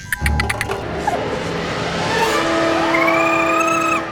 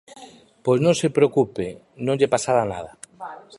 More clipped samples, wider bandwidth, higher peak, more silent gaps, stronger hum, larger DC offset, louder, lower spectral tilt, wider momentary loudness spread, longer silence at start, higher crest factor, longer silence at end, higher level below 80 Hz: neither; first, over 20 kHz vs 11.5 kHz; first, 0 dBFS vs -4 dBFS; neither; neither; neither; first, -17 LUFS vs -21 LUFS; about the same, -4.5 dB/octave vs -5.5 dB/octave; second, 7 LU vs 19 LU; second, 0 s vs 0.15 s; about the same, 18 dB vs 18 dB; about the same, 0 s vs 0.05 s; first, -32 dBFS vs -58 dBFS